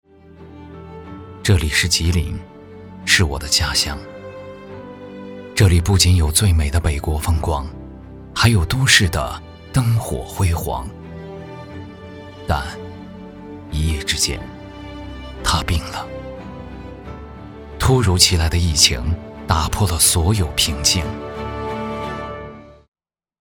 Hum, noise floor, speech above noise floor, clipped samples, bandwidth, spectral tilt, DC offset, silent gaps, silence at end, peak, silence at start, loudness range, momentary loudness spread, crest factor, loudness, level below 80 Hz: none; -42 dBFS; 25 dB; under 0.1%; over 20 kHz; -3.5 dB/octave; under 0.1%; none; 0.7 s; 0 dBFS; 0.3 s; 9 LU; 22 LU; 20 dB; -18 LUFS; -28 dBFS